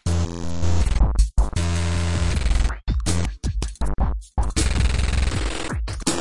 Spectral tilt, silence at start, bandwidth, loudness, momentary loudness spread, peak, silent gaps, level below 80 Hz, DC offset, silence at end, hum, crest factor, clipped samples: -5 dB/octave; 0 s; 11.5 kHz; -24 LUFS; 6 LU; -6 dBFS; none; -24 dBFS; 3%; 0 s; none; 14 dB; under 0.1%